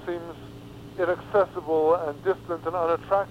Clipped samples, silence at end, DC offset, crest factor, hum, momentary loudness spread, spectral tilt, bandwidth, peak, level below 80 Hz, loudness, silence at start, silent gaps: under 0.1%; 0 s; under 0.1%; 16 dB; none; 18 LU; -7 dB/octave; 15.5 kHz; -10 dBFS; -56 dBFS; -26 LUFS; 0 s; none